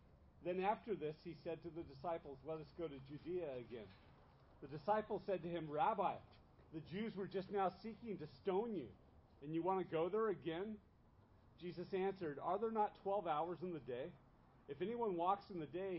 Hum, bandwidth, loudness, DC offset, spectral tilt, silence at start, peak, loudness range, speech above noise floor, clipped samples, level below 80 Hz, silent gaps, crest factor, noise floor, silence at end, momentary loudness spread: none; 5.6 kHz; -44 LUFS; under 0.1%; -5.5 dB/octave; 0.15 s; -26 dBFS; 4 LU; 25 dB; under 0.1%; -72 dBFS; none; 20 dB; -69 dBFS; 0 s; 13 LU